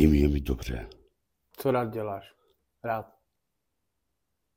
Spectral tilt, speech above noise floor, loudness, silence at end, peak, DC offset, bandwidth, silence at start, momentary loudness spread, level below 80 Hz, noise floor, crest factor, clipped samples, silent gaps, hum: -8 dB/octave; 55 dB; -30 LUFS; 1.55 s; -8 dBFS; under 0.1%; 16.5 kHz; 0 s; 15 LU; -36 dBFS; -82 dBFS; 22 dB; under 0.1%; none; none